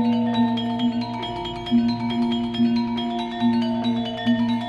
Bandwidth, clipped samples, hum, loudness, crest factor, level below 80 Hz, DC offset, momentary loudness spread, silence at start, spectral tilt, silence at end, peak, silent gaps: 7.6 kHz; under 0.1%; none; -23 LUFS; 12 dB; -50 dBFS; under 0.1%; 6 LU; 0 s; -7 dB/octave; 0 s; -10 dBFS; none